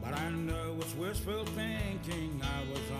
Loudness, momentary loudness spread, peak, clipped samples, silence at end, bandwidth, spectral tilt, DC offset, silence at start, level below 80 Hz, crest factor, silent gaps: -37 LUFS; 2 LU; -22 dBFS; under 0.1%; 0 s; 15.5 kHz; -5 dB/octave; under 0.1%; 0 s; -44 dBFS; 14 dB; none